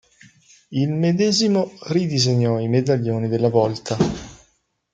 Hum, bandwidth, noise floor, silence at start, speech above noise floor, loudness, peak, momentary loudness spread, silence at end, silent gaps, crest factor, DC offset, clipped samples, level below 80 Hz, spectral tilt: none; 9.2 kHz; -64 dBFS; 0.7 s; 45 dB; -20 LUFS; -2 dBFS; 6 LU; 0.6 s; none; 18 dB; under 0.1%; under 0.1%; -52 dBFS; -6 dB/octave